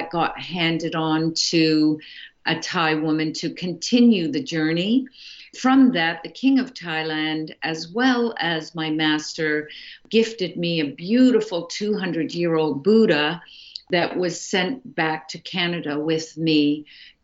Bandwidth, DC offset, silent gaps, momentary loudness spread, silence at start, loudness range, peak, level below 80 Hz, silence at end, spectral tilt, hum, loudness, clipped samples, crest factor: 8 kHz; under 0.1%; none; 10 LU; 0 s; 3 LU; -6 dBFS; -64 dBFS; 0.15 s; -4.5 dB/octave; none; -22 LUFS; under 0.1%; 16 dB